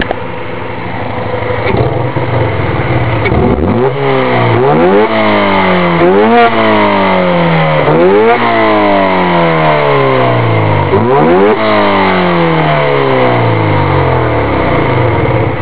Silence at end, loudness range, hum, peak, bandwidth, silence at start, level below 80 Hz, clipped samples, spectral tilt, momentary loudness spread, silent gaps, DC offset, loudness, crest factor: 0 s; 4 LU; none; 0 dBFS; 4 kHz; 0 s; -28 dBFS; 0.3%; -10.5 dB/octave; 6 LU; none; 7%; -9 LUFS; 10 dB